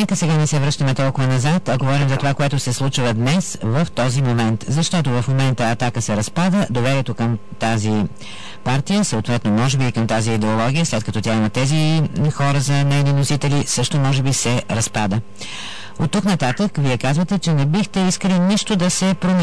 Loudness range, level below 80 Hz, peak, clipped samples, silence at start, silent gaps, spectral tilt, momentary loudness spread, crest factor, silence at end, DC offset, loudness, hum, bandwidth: 2 LU; -44 dBFS; -10 dBFS; under 0.1%; 0 s; none; -5.5 dB/octave; 4 LU; 8 dB; 0 s; 3%; -18 LUFS; none; 11 kHz